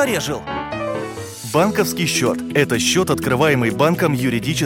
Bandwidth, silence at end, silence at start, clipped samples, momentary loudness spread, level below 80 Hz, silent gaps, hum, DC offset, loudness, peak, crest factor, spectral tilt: 17 kHz; 0 s; 0 s; under 0.1%; 9 LU; -46 dBFS; none; none; under 0.1%; -18 LUFS; -2 dBFS; 18 dB; -4.5 dB/octave